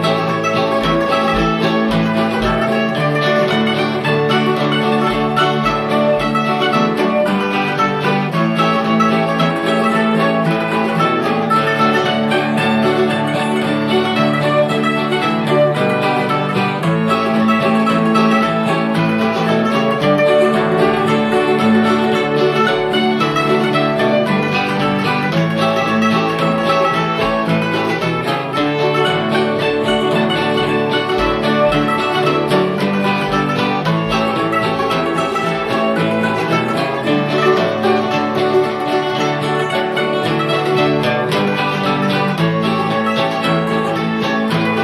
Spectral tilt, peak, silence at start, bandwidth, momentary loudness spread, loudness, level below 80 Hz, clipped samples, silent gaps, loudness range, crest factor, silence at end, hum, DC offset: -6 dB/octave; -2 dBFS; 0 s; 14 kHz; 3 LU; -15 LUFS; -42 dBFS; under 0.1%; none; 2 LU; 14 dB; 0 s; none; under 0.1%